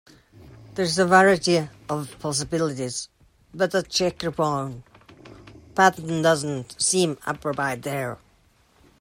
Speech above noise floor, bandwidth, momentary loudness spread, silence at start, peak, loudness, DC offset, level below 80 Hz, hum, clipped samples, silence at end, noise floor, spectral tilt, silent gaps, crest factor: 37 dB; 16 kHz; 13 LU; 0.4 s; -4 dBFS; -23 LUFS; under 0.1%; -56 dBFS; none; under 0.1%; 0.85 s; -60 dBFS; -4 dB/octave; none; 20 dB